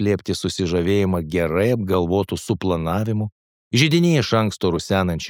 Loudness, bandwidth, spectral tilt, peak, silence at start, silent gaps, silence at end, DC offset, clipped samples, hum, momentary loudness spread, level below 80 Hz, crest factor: -20 LUFS; 17.5 kHz; -6 dB/octave; -2 dBFS; 0 s; 3.32-3.71 s; 0 s; under 0.1%; under 0.1%; none; 7 LU; -44 dBFS; 18 dB